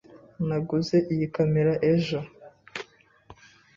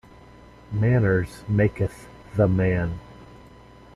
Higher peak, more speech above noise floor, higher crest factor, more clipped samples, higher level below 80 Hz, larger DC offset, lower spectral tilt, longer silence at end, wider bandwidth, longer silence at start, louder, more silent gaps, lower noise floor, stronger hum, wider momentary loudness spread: second, -12 dBFS vs -6 dBFS; about the same, 29 dB vs 26 dB; about the same, 16 dB vs 18 dB; neither; second, -58 dBFS vs -44 dBFS; neither; second, -7.5 dB/octave vs -9 dB/octave; second, 0.45 s vs 0.7 s; second, 7.4 kHz vs 12 kHz; second, 0.15 s vs 0.7 s; about the same, -25 LUFS vs -23 LUFS; neither; first, -53 dBFS vs -48 dBFS; neither; first, 16 LU vs 12 LU